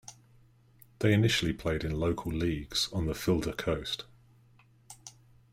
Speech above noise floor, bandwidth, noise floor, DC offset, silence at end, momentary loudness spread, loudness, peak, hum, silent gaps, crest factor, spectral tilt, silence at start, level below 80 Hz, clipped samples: 32 dB; 16 kHz; -62 dBFS; under 0.1%; 0.4 s; 23 LU; -30 LUFS; -14 dBFS; none; none; 20 dB; -5 dB/octave; 0.1 s; -48 dBFS; under 0.1%